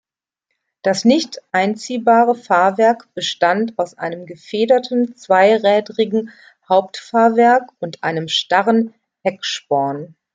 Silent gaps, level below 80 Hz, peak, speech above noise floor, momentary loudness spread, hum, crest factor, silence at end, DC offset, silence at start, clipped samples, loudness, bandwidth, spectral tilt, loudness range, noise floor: none; -68 dBFS; -2 dBFS; 61 dB; 11 LU; none; 16 dB; 0.3 s; under 0.1%; 0.85 s; under 0.1%; -17 LUFS; 9.2 kHz; -4.5 dB/octave; 1 LU; -77 dBFS